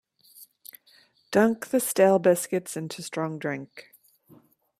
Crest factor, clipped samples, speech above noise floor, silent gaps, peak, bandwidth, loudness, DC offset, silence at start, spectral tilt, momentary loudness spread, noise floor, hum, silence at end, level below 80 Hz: 20 dB; under 0.1%; 36 dB; none; -8 dBFS; 16 kHz; -25 LUFS; under 0.1%; 0.4 s; -5 dB/octave; 25 LU; -60 dBFS; none; 1 s; -72 dBFS